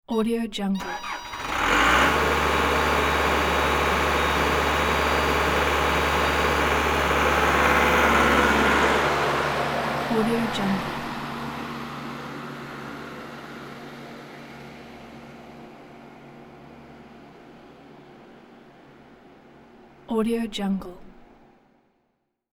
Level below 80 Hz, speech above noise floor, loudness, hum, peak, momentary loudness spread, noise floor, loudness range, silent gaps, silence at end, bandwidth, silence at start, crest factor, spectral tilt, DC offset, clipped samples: -38 dBFS; 48 dB; -22 LUFS; none; -6 dBFS; 22 LU; -74 dBFS; 20 LU; none; 1.45 s; over 20 kHz; 0.1 s; 18 dB; -4 dB/octave; under 0.1%; under 0.1%